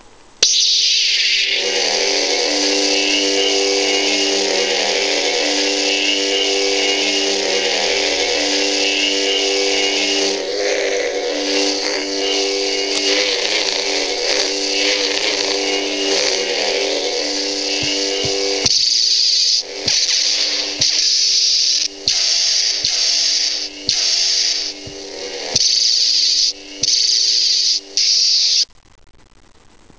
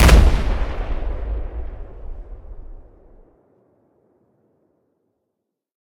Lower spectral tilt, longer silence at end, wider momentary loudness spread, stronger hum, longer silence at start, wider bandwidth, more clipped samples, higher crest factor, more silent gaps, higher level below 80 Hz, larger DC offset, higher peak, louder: second, 0.5 dB/octave vs -5.5 dB/octave; second, 1.35 s vs 3 s; second, 6 LU vs 26 LU; neither; first, 0.4 s vs 0 s; second, 8 kHz vs 16.5 kHz; neither; about the same, 18 dB vs 20 dB; neither; second, -54 dBFS vs -22 dBFS; first, 0.3% vs under 0.1%; about the same, 0 dBFS vs 0 dBFS; first, -14 LUFS vs -22 LUFS